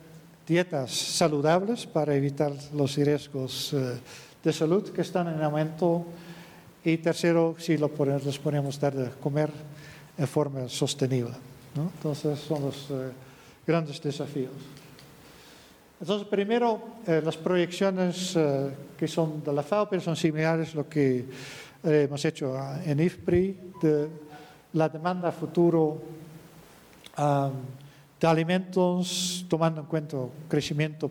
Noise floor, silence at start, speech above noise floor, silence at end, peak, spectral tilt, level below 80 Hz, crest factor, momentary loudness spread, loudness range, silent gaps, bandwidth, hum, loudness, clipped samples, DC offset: -54 dBFS; 0 s; 27 dB; 0 s; -12 dBFS; -6 dB/octave; -62 dBFS; 16 dB; 15 LU; 4 LU; none; 19 kHz; none; -28 LUFS; under 0.1%; under 0.1%